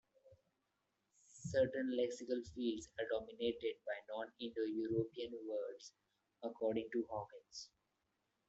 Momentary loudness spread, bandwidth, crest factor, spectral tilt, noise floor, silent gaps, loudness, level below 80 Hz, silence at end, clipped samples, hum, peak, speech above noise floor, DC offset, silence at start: 14 LU; 8.2 kHz; 18 dB; -5.5 dB/octave; -86 dBFS; none; -42 LUFS; -74 dBFS; 0.8 s; under 0.1%; none; -24 dBFS; 44 dB; under 0.1%; 0.25 s